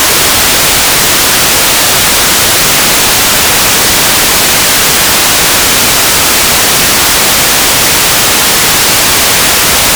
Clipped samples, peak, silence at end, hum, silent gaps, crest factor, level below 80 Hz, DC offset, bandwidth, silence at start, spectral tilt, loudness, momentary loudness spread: 9%; 0 dBFS; 0 s; none; none; 6 dB; -28 dBFS; under 0.1%; over 20 kHz; 0 s; -0.5 dB/octave; -4 LUFS; 0 LU